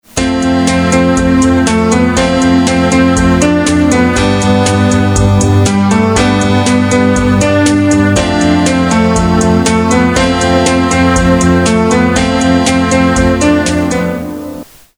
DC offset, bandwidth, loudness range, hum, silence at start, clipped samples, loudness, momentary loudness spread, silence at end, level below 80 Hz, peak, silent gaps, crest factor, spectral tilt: under 0.1%; 15.5 kHz; 0 LU; none; 0.15 s; 0.4%; -9 LUFS; 2 LU; 0.35 s; -26 dBFS; 0 dBFS; none; 10 dB; -5 dB/octave